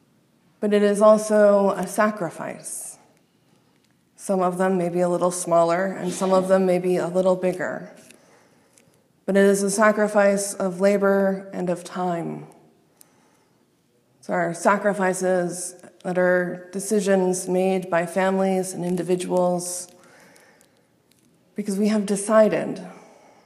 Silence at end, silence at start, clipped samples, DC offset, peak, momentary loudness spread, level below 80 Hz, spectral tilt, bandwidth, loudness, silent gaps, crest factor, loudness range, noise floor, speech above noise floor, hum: 0.5 s; 0.6 s; under 0.1%; under 0.1%; -4 dBFS; 14 LU; -76 dBFS; -5.5 dB/octave; 14.5 kHz; -21 LUFS; none; 20 dB; 6 LU; -63 dBFS; 42 dB; none